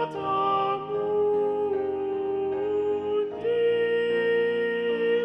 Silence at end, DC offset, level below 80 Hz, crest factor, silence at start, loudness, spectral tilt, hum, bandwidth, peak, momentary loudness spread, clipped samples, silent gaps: 0 s; under 0.1%; -66 dBFS; 10 dB; 0 s; -26 LUFS; -7 dB/octave; none; 5.4 kHz; -14 dBFS; 4 LU; under 0.1%; none